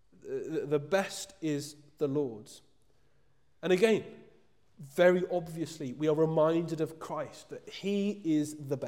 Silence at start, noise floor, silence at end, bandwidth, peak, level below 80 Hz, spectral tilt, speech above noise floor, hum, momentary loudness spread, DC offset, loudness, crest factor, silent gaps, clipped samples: 0.25 s; -72 dBFS; 0 s; 16.5 kHz; -12 dBFS; -74 dBFS; -6 dB/octave; 41 dB; none; 14 LU; under 0.1%; -31 LUFS; 20 dB; none; under 0.1%